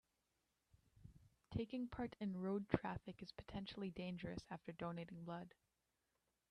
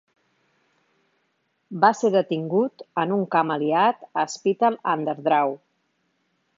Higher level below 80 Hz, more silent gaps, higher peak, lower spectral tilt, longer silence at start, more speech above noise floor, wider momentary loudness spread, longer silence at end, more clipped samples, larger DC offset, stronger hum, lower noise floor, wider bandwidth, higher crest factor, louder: first, -68 dBFS vs -80 dBFS; neither; second, -18 dBFS vs -2 dBFS; first, -7.5 dB/octave vs -5.5 dB/octave; second, 0.75 s vs 1.7 s; second, 41 dB vs 50 dB; first, 15 LU vs 7 LU; about the same, 1 s vs 1 s; neither; neither; neither; first, -88 dBFS vs -71 dBFS; first, 10.5 kHz vs 7.6 kHz; first, 30 dB vs 22 dB; second, -48 LUFS vs -22 LUFS